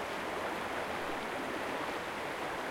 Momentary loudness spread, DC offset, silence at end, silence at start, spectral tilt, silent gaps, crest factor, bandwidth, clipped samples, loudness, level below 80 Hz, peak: 1 LU; under 0.1%; 0 s; 0 s; -3.5 dB/octave; none; 14 dB; 16.5 kHz; under 0.1%; -37 LUFS; -64 dBFS; -24 dBFS